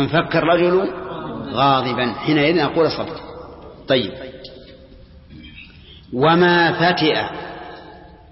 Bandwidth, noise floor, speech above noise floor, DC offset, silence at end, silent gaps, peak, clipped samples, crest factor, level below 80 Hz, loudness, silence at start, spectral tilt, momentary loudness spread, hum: 6 kHz; -43 dBFS; 26 dB; under 0.1%; 0.3 s; none; -4 dBFS; under 0.1%; 16 dB; -48 dBFS; -18 LUFS; 0 s; -9 dB/octave; 23 LU; none